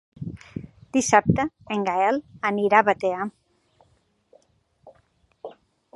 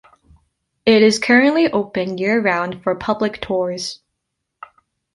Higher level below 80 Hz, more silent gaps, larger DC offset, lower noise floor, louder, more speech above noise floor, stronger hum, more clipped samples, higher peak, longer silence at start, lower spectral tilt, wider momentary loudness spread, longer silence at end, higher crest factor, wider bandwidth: about the same, -52 dBFS vs -54 dBFS; neither; neither; second, -65 dBFS vs -77 dBFS; second, -22 LUFS vs -17 LUFS; second, 44 dB vs 60 dB; neither; neither; about the same, -2 dBFS vs -2 dBFS; second, 0.2 s vs 0.85 s; about the same, -5 dB/octave vs -4.5 dB/octave; first, 22 LU vs 11 LU; second, 0.45 s vs 1.2 s; first, 24 dB vs 16 dB; about the same, 11.5 kHz vs 11.5 kHz